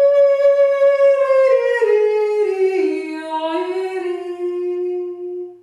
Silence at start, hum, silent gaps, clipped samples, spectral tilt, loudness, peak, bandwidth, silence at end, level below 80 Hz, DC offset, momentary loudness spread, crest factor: 0 s; none; none; under 0.1%; -3.5 dB/octave; -17 LUFS; -4 dBFS; 10 kHz; 0.05 s; -72 dBFS; under 0.1%; 12 LU; 12 dB